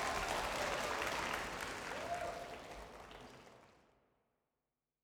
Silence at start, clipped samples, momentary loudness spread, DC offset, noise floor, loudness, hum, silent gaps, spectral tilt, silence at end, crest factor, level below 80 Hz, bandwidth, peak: 0 s; under 0.1%; 17 LU; under 0.1%; under -90 dBFS; -41 LUFS; none; none; -2.5 dB/octave; 1.35 s; 20 dB; -60 dBFS; over 20 kHz; -24 dBFS